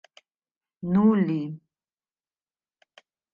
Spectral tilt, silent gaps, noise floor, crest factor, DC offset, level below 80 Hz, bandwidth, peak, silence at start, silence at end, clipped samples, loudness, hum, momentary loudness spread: -10 dB/octave; none; under -90 dBFS; 18 dB; under 0.1%; -66 dBFS; 5 kHz; -10 dBFS; 0.85 s; 1.75 s; under 0.1%; -23 LUFS; none; 17 LU